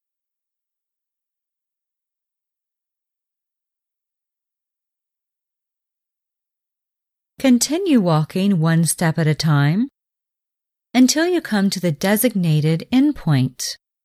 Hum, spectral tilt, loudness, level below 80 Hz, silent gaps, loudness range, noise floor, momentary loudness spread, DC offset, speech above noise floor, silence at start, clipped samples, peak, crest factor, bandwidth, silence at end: none; -5.5 dB/octave; -18 LUFS; -56 dBFS; none; 4 LU; -86 dBFS; 6 LU; under 0.1%; 69 dB; 7.4 s; under 0.1%; -2 dBFS; 18 dB; 16 kHz; 0.3 s